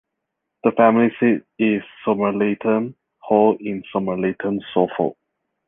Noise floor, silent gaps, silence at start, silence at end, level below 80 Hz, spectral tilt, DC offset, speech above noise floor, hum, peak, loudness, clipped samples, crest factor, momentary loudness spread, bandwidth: -79 dBFS; none; 0.65 s; 0.55 s; -62 dBFS; -10.5 dB/octave; under 0.1%; 60 dB; none; -2 dBFS; -20 LUFS; under 0.1%; 18 dB; 9 LU; 3.8 kHz